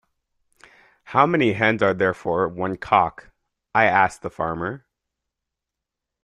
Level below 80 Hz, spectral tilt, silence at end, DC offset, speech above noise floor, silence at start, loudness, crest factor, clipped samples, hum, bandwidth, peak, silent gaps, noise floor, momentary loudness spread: -56 dBFS; -6.5 dB/octave; 1.45 s; under 0.1%; 64 dB; 1.1 s; -21 LUFS; 22 dB; under 0.1%; none; 11.5 kHz; -2 dBFS; none; -85 dBFS; 11 LU